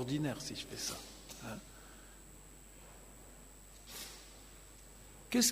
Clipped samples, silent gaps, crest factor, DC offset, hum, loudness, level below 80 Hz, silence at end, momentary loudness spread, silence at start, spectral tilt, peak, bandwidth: under 0.1%; none; 24 dB; under 0.1%; none; -41 LUFS; -60 dBFS; 0 s; 18 LU; 0 s; -3 dB/octave; -18 dBFS; 15.5 kHz